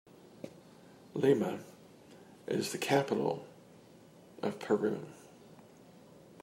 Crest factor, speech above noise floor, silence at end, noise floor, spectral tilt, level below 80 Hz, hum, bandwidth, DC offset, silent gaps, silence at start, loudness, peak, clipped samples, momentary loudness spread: 22 dB; 26 dB; 0 s; -58 dBFS; -5.5 dB/octave; -80 dBFS; none; 16 kHz; under 0.1%; none; 0.25 s; -34 LUFS; -14 dBFS; under 0.1%; 26 LU